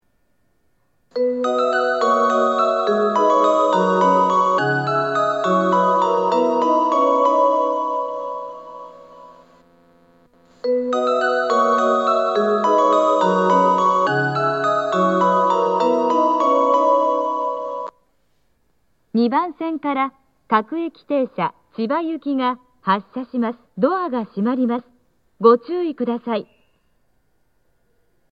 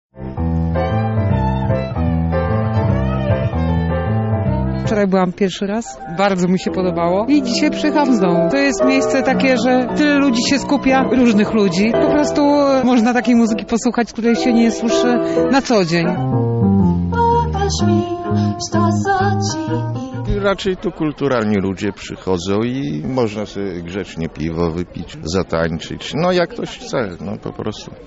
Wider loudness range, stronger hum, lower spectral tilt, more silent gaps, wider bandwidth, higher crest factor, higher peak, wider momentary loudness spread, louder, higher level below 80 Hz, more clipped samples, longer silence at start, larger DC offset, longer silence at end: about the same, 7 LU vs 7 LU; neither; about the same, -6 dB/octave vs -6 dB/octave; neither; about the same, 8 kHz vs 8 kHz; first, 18 dB vs 12 dB; first, 0 dBFS vs -4 dBFS; about the same, 10 LU vs 10 LU; about the same, -18 LUFS vs -17 LUFS; second, -70 dBFS vs -34 dBFS; neither; first, 1.15 s vs 0.15 s; neither; first, 1.9 s vs 0 s